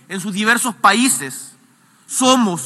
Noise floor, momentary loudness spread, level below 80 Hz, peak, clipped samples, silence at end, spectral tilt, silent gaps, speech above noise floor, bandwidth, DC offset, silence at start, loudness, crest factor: -52 dBFS; 12 LU; -76 dBFS; 0 dBFS; under 0.1%; 0 s; -2.5 dB/octave; none; 36 dB; 13 kHz; under 0.1%; 0.1 s; -15 LUFS; 18 dB